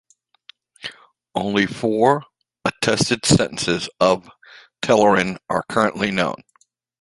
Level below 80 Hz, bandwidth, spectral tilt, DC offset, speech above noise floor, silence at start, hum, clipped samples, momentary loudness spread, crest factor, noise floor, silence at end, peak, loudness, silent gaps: -50 dBFS; 11.5 kHz; -4.5 dB/octave; under 0.1%; 32 dB; 0.85 s; none; under 0.1%; 13 LU; 20 dB; -51 dBFS; 0.65 s; 0 dBFS; -19 LUFS; none